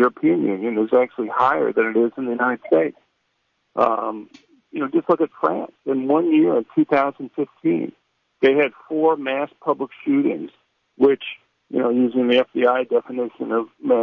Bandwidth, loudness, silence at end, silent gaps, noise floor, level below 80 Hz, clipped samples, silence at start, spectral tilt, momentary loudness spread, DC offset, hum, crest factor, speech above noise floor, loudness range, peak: 5.6 kHz; -20 LUFS; 0 s; none; -70 dBFS; -70 dBFS; under 0.1%; 0 s; -8 dB/octave; 10 LU; under 0.1%; none; 16 dB; 51 dB; 3 LU; -4 dBFS